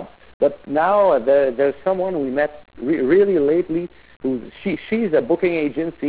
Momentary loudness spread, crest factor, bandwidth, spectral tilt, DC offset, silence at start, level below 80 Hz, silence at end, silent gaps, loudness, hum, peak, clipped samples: 11 LU; 14 dB; 4 kHz; -10.5 dB/octave; 0.3%; 0 s; -54 dBFS; 0 s; 0.34-0.40 s, 4.16-4.20 s; -19 LUFS; none; -6 dBFS; under 0.1%